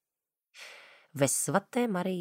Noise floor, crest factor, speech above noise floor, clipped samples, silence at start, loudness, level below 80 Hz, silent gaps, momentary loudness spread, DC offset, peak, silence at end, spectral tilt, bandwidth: under -90 dBFS; 22 dB; over 61 dB; under 0.1%; 0.55 s; -29 LUFS; -76 dBFS; none; 21 LU; under 0.1%; -12 dBFS; 0 s; -4 dB/octave; 16 kHz